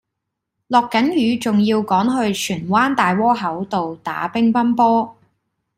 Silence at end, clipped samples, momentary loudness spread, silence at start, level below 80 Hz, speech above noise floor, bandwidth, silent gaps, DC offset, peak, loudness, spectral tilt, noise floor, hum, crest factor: 0.65 s; under 0.1%; 7 LU; 0.7 s; -58 dBFS; 62 dB; 16 kHz; none; under 0.1%; -2 dBFS; -18 LUFS; -5.5 dB/octave; -79 dBFS; none; 16 dB